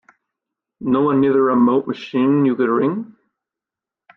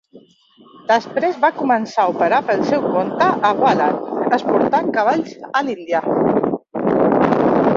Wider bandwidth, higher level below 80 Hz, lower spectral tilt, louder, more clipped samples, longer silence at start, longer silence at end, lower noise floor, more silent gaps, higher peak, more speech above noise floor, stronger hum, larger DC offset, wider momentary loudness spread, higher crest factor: second, 6 kHz vs 7.4 kHz; second, -62 dBFS vs -56 dBFS; first, -9 dB/octave vs -6.5 dB/octave; about the same, -17 LUFS vs -17 LUFS; neither; first, 0.8 s vs 0.15 s; first, 1.1 s vs 0 s; first, -88 dBFS vs -50 dBFS; neither; second, -4 dBFS vs 0 dBFS; first, 71 dB vs 33 dB; neither; neither; first, 11 LU vs 6 LU; about the same, 14 dB vs 16 dB